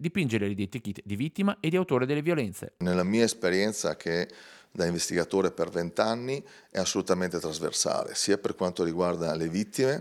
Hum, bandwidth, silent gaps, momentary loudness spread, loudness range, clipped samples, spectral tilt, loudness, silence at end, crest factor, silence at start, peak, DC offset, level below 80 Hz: none; 16 kHz; none; 7 LU; 2 LU; under 0.1%; -4.5 dB/octave; -29 LUFS; 0 s; 20 dB; 0 s; -8 dBFS; under 0.1%; -66 dBFS